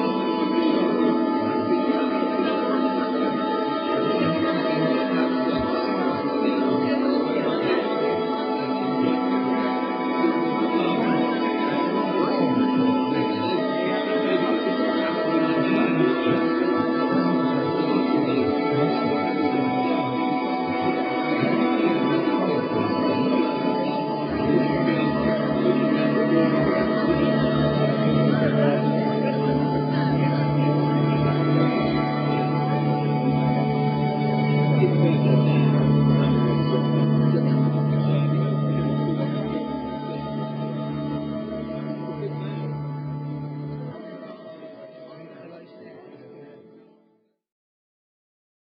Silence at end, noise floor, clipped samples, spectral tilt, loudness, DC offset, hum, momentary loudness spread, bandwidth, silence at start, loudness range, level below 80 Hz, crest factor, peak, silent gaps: 2.05 s; -64 dBFS; under 0.1%; -6.5 dB/octave; -22 LUFS; under 0.1%; none; 10 LU; 5.4 kHz; 0 s; 9 LU; -54 dBFS; 16 dB; -6 dBFS; none